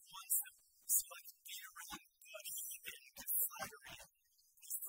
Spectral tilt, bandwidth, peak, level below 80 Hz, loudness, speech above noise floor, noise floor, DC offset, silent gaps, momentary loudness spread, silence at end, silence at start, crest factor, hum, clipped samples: 1 dB/octave; 16.5 kHz; -20 dBFS; -80 dBFS; -41 LUFS; 31 dB; -76 dBFS; under 0.1%; none; 19 LU; 0 s; 0 s; 26 dB; none; under 0.1%